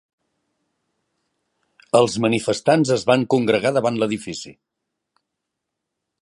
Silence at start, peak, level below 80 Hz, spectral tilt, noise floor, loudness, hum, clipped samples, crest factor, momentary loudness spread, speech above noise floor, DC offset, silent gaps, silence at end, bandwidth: 1.95 s; -2 dBFS; -62 dBFS; -5 dB/octave; -81 dBFS; -19 LUFS; none; under 0.1%; 20 dB; 11 LU; 62 dB; under 0.1%; none; 1.7 s; 11.5 kHz